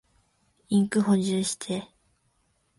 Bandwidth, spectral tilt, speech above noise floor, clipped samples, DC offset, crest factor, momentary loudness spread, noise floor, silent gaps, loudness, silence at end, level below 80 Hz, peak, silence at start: 11.5 kHz; -5.5 dB/octave; 46 dB; under 0.1%; under 0.1%; 16 dB; 10 LU; -70 dBFS; none; -26 LUFS; 0.95 s; -66 dBFS; -12 dBFS; 0.7 s